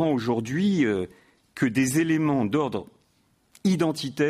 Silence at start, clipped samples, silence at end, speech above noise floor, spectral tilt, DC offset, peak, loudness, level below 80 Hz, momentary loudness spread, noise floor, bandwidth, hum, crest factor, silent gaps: 0 s; under 0.1%; 0 s; 42 dB; -6 dB/octave; under 0.1%; -12 dBFS; -25 LUFS; -62 dBFS; 8 LU; -66 dBFS; 15.5 kHz; none; 14 dB; none